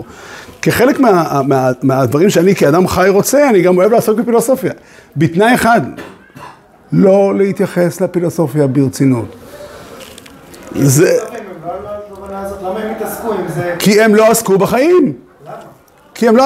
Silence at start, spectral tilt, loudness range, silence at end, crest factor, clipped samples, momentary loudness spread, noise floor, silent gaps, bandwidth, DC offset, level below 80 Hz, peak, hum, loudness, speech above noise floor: 0 s; -5.5 dB/octave; 6 LU; 0 s; 12 dB; under 0.1%; 22 LU; -41 dBFS; none; 16.5 kHz; under 0.1%; -46 dBFS; 0 dBFS; none; -12 LUFS; 31 dB